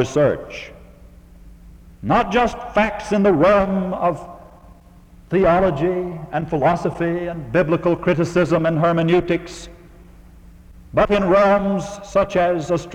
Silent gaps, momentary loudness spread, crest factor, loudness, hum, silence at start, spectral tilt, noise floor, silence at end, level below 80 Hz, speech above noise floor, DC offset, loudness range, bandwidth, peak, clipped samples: none; 11 LU; 16 dB; -18 LUFS; none; 0 s; -7 dB/octave; -46 dBFS; 0 s; -40 dBFS; 28 dB; under 0.1%; 2 LU; 11 kHz; -4 dBFS; under 0.1%